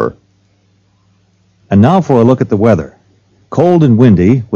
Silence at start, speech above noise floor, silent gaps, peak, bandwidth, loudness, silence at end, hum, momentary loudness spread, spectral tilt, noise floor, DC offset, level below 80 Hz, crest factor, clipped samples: 0 s; 45 dB; none; 0 dBFS; 7.2 kHz; -10 LUFS; 0 s; none; 10 LU; -9 dB/octave; -53 dBFS; under 0.1%; -40 dBFS; 10 dB; 2%